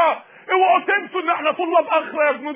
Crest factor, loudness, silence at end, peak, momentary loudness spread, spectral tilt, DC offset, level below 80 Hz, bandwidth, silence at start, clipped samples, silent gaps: 14 dB; -19 LUFS; 0 s; -6 dBFS; 6 LU; -6.5 dB/octave; under 0.1%; -80 dBFS; 3.8 kHz; 0 s; under 0.1%; none